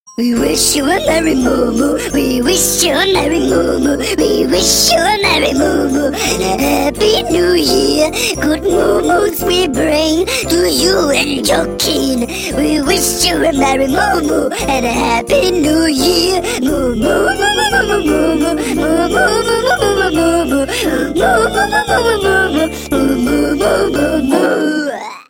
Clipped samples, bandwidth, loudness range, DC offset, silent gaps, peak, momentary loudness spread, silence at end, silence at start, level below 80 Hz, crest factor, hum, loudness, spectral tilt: under 0.1%; 17 kHz; 1 LU; under 0.1%; none; 0 dBFS; 4 LU; 0.05 s; 0.1 s; -30 dBFS; 12 dB; none; -12 LUFS; -3 dB/octave